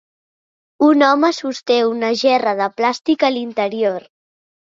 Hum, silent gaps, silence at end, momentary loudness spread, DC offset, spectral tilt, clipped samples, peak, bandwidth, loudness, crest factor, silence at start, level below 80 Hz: none; none; 0.7 s; 8 LU; under 0.1%; -4 dB/octave; under 0.1%; -2 dBFS; 7.6 kHz; -16 LUFS; 16 dB; 0.8 s; -66 dBFS